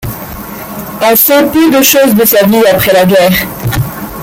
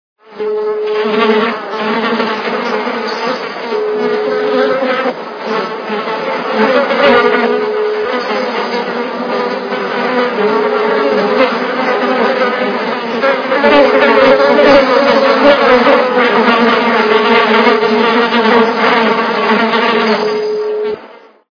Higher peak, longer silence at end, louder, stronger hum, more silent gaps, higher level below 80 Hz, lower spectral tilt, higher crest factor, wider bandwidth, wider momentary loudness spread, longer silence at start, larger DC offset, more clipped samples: about the same, 0 dBFS vs 0 dBFS; second, 0 s vs 0.35 s; first, -7 LUFS vs -12 LUFS; neither; neither; first, -34 dBFS vs -50 dBFS; about the same, -4.5 dB/octave vs -5 dB/octave; about the same, 8 dB vs 12 dB; first, over 20 kHz vs 5.4 kHz; first, 16 LU vs 10 LU; second, 0 s vs 0.3 s; neither; about the same, 0.2% vs 0.3%